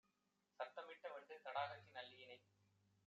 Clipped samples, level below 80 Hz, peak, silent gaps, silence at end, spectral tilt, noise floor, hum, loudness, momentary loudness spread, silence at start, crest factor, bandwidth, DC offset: under 0.1%; under -90 dBFS; -32 dBFS; none; 0.65 s; -0.5 dB/octave; -86 dBFS; 50 Hz at -80 dBFS; -53 LUFS; 14 LU; 0.6 s; 24 dB; 7.4 kHz; under 0.1%